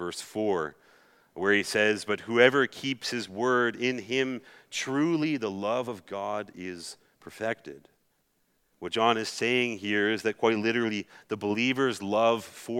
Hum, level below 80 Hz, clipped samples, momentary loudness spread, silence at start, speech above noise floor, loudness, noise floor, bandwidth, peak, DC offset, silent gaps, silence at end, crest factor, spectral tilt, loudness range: none; -78 dBFS; under 0.1%; 13 LU; 0 s; 44 dB; -28 LUFS; -72 dBFS; 16 kHz; -4 dBFS; under 0.1%; none; 0 s; 24 dB; -4 dB/octave; 7 LU